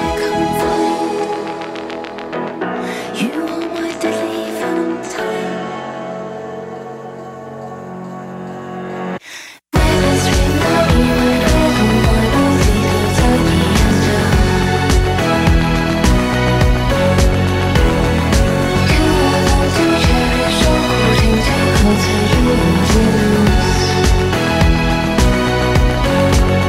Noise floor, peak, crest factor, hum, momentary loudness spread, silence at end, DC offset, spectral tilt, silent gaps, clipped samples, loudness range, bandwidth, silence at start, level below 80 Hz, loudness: -35 dBFS; -2 dBFS; 12 dB; none; 14 LU; 0 s; under 0.1%; -5.5 dB/octave; none; under 0.1%; 10 LU; 16 kHz; 0 s; -20 dBFS; -14 LUFS